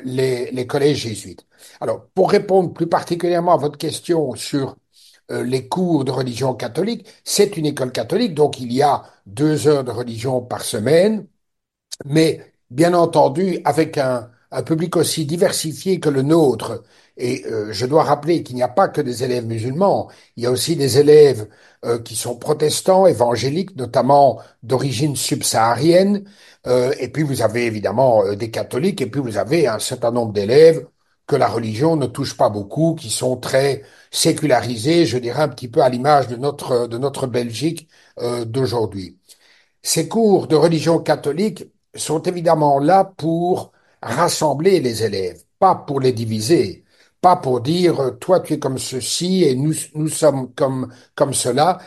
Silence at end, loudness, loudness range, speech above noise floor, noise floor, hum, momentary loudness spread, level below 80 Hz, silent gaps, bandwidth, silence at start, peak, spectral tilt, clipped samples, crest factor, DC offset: 0 s; -18 LUFS; 4 LU; 60 dB; -78 dBFS; none; 10 LU; -58 dBFS; none; 12.5 kHz; 0 s; 0 dBFS; -5 dB/octave; under 0.1%; 18 dB; under 0.1%